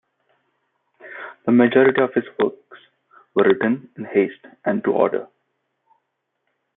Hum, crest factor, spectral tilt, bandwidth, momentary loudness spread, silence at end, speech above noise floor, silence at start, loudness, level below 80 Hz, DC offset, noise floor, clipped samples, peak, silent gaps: none; 20 dB; -11 dB/octave; 3.9 kHz; 13 LU; 1.5 s; 57 dB; 1.05 s; -20 LUFS; -68 dBFS; under 0.1%; -75 dBFS; under 0.1%; -2 dBFS; none